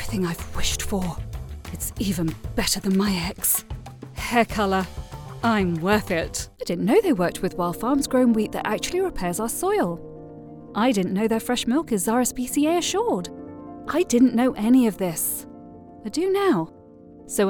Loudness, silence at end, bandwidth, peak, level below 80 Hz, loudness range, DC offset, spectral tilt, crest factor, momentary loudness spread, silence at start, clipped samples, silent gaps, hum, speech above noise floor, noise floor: -23 LUFS; 0 s; 19 kHz; -6 dBFS; -42 dBFS; 3 LU; under 0.1%; -4.5 dB/octave; 16 dB; 17 LU; 0 s; under 0.1%; none; none; 24 dB; -46 dBFS